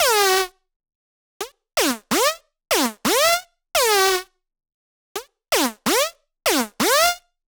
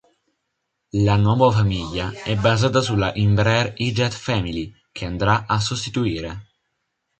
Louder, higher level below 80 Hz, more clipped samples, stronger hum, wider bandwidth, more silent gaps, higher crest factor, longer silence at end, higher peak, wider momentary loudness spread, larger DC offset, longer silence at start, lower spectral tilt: about the same, -19 LUFS vs -20 LUFS; second, -56 dBFS vs -40 dBFS; neither; neither; first, over 20 kHz vs 8.8 kHz; first, 0.76-0.80 s, 0.95-1.40 s, 4.74-5.15 s vs none; about the same, 16 dB vs 18 dB; second, 0.3 s vs 0.75 s; second, -6 dBFS vs -2 dBFS; first, 18 LU vs 12 LU; neither; second, 0 s vs 0.95 s; second, -1 dB/octave vs -6 dB/octave